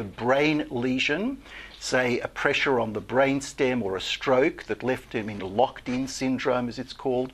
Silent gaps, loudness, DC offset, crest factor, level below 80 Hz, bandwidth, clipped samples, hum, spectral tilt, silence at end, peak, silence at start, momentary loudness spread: none; -26 LUFS; under 0.1%; 20 dB; -54 dBFS; 13.5 kHz; under 0.1%; none; -4.5 dB/octave; 0 s; -6 dBFS; 0 s; 9 LU